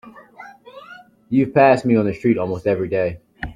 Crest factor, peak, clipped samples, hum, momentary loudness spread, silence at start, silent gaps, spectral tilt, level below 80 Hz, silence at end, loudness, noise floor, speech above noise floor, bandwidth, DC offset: 18 dB; -2 dBFS; under 0.1%; none; 16 LU; 0.05 s; none; -8.5 dB/octave; -48 dBFS; 0 s; -18 LUFS; -43 dBFS; 26 dB; 10.5 kHz; under 0.1%